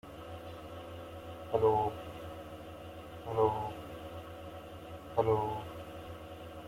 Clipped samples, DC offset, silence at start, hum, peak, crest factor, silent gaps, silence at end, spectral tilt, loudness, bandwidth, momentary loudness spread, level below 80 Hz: under 0.1%; under 0.1%; 0.05 s; none; -14 dBFS; 22 dB; none; 0 s; -7 dB/octave; -36 LUFS; 16.5 kHz; 17 LU; -60 dBFS